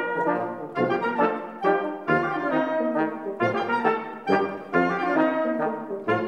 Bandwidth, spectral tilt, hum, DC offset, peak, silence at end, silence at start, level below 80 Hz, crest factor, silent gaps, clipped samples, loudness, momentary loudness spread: 9 kHz; -7.5 dB/octave; none; under 0.1%; -8 dBFS; 0 s; 0 s; -68 dBFS; 18 dB; none; under 0.1%; -25 LUFS; 5 LU